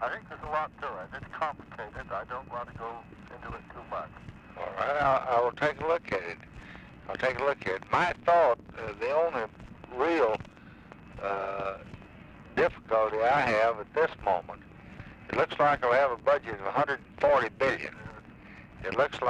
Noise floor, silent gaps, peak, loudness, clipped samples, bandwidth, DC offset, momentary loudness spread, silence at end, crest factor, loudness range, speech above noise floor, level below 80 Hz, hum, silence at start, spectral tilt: -50 dBFS; none; -12 dBFS; -29 LUFS; under 0.1%; 9.8 kHz; under 0.1%; 22 LU; 0 s; 18 dB; 9 LU; 21 dB; -56 dBFS; none; 0 s; -5.5 dB/octave